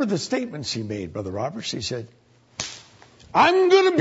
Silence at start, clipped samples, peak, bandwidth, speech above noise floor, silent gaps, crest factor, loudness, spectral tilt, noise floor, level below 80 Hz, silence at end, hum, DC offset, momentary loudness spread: 0 s; under 0.1%; -4 dBFS; 8 kHz; 29 dB; none; 18 dB; -23 LUFS; -4.5 dB/octave; -50 dBFS; -60 dBFS; 0 s; none; under 0.1%; 17 LU